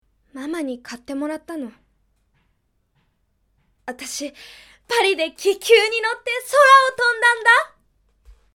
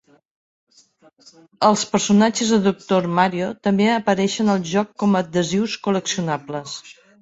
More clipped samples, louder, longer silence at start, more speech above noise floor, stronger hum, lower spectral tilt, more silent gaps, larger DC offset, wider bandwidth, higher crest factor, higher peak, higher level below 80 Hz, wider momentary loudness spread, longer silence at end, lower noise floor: neither; about the same, -17 LUFS vs -19 LUFS; second, 0.35 s vs 1.6 s; first, 49 dB vs 35 dB; neither; second, -0.5 dB/octave vs -5 dB/octave; neither; neither; first, 18 kHz vs 8 kHz; about the same, 20 dB vs 18 dB; about the same, 0 dBFS vs -2 dBFS; about the same, -62 dBFS vs -60 dBFS; first, 21 LU vs 8 LU; first, 0.9 s vs 0.3 s; first, -67 dBFS vs -55 dBFS